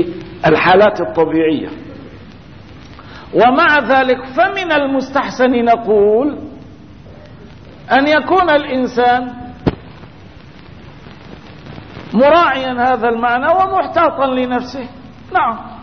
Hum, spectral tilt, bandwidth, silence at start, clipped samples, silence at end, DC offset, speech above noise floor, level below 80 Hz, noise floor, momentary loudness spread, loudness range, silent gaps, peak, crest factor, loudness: none; -6.5 dB/octave; 6.6 kHz; 0 s; under 0.1%; 0 s; 0.6%; 25 dB; -44 dBFS; -38 dBFS; 22 LU; 4 LU; none; 0 dBFS; 14 dB; -13 LUFS